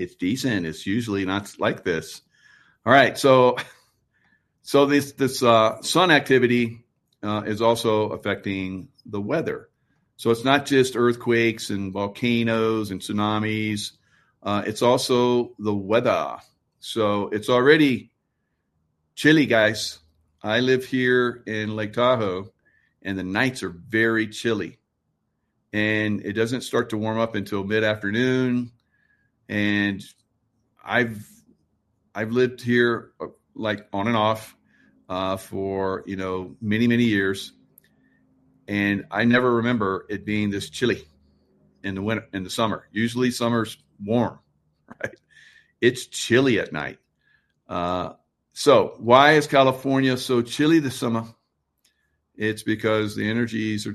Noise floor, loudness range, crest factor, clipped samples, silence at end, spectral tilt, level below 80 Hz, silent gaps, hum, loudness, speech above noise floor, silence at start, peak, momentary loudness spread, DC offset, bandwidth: -75 dBFS; 6 LU; 22 dB; under 0.1%; 0 s; -5 dB/octave; -60 dBFS; none; none; -22 LUFS; 53 dB; 0 s; 0 dBFS; 14 LU; under 0.1%; 13 kHz